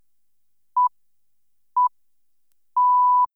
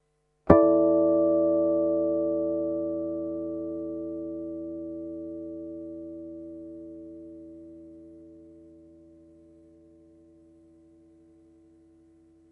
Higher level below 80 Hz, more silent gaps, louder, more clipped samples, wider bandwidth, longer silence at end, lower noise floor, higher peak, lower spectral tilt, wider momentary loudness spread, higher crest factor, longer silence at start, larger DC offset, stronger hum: second, -86 dBFS vs -54 dBFS; neither; first, -21 LUFS vs -26 LUFS; neither; second, 1.4 kHz vs 2.5 kHz; second, 0.1 s vs 3.8 s; first, -79 dBFS vs -58 dBFS; second, -14 dBFS vs 0 dBFS; second, -2.5 dB/octave vs -11.5 dB/octave; second, 11 LU vs 24 LU; second, 10 dB vs 28 dB; first, 0.75 s vs 0.45 s; first, 0.1% vs under 0.1%; first, 50 Hz at -100 dBFS vs none